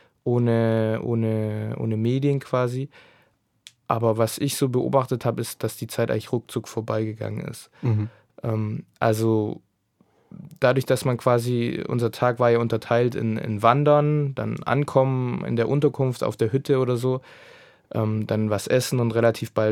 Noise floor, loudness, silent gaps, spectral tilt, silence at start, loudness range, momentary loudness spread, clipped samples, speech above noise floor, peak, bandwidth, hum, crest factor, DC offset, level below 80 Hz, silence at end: -64 dBFS; -23 LUFS; none; -6.5 dB/octave; 0.25 s; 6 LU; 9 LU; under 0.1%; 42 dB; -2 dBFS; 16 kHz; none; 20 dB; under 0.1%; -62 dBFS; 0 s